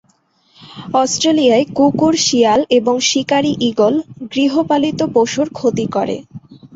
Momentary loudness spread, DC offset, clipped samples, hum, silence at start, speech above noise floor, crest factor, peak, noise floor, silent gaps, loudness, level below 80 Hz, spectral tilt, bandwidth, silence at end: 7 LU; under 0.1%; under 0.1%; none; 0.6 s; 43 dB; 14 dB; -2 dBFS; -57 dBFS; none; -15 LUFS; -54 dBFS; -4 dB/octave; 8 kHz; 0.1 s